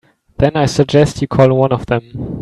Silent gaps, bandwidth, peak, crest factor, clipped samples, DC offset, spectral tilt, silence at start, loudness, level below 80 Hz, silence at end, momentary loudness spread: none; 12 kHz; 0 dBFS; 14 dB; under 0.1%; under 0.1%; -6.5 dB/octave; 0.4 s; -14 LUFS; -38 dBFS; 0 s; 8 LU